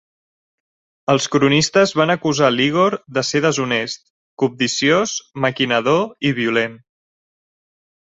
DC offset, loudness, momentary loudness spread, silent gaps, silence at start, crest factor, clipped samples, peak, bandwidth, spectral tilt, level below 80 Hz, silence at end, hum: under 0.1%; -17 LUFS; 7 LU; 4.10-4.37 s; 1.1 s; 18 dB; under 0.1%; -2 dBFS; 8.2 kHz; -4 dB/octave; -58 dBFS; 1.45 s; none